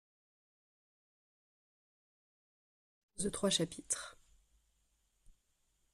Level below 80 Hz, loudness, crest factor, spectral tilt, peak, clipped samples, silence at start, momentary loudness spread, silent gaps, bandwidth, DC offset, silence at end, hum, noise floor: -68 dBFS; -36 LUFS; 24 dB; -3 dB/octave; -20 dBFS; under 0.1%; 3.15 s; 16 LU; none; 13.5 kHz; under 0.1%; 1.8 s; none; -78 dBFS